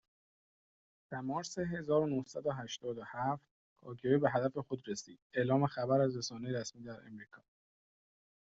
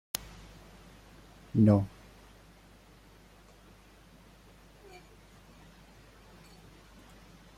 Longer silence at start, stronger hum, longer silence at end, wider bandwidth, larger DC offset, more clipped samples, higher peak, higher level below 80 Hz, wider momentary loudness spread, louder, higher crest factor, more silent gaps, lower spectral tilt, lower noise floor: second, 1.1 s vs 1.55 s; neither; second, 1.05 s vs 5.7 s; second, 8 kHz vs 16.5 kHz; neither; neither; second, -16 dBFS vs -6 dBFS; second, -72 dBFS vs -58 dBFS; second, 15 LU vs 31 LU; second, -36 LUFS vs -28 LUFS; second, 20 dB vs 30 dB; first, 3.51-3.76 s, 5.22-5.30 s vs none; about the same, -6 dB/octave vs -7 dB/octave; first, under -90 dBFS vs -57 dBFS